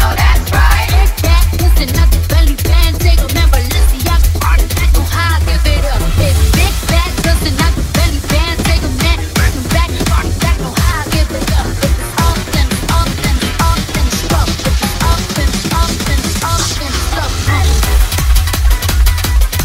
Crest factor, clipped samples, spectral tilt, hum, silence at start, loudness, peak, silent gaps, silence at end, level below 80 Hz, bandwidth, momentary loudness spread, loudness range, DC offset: 10 dB; under 0.1%; -4.5 dB/octave; none; 0 s; -13 LUFS; 0 dBFS; none; 0 s; -12 dBFS; 16.5 kHz; 3 LU; 2 LU; under 0.1%